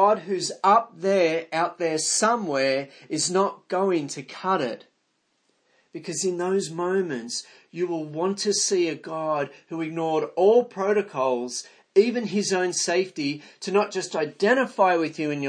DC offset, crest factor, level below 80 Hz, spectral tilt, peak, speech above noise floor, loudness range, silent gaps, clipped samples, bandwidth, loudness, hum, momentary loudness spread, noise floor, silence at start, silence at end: under 0.1%; 18 dB; -82 dBFS; -3.5 dB/octave; -6 dBFS; 47 dB; 5 LU; none; under 0.1%; 10.5 kHz; -24 LUFS; none; 11 LU; -72 dBFS; 0 s; 0 s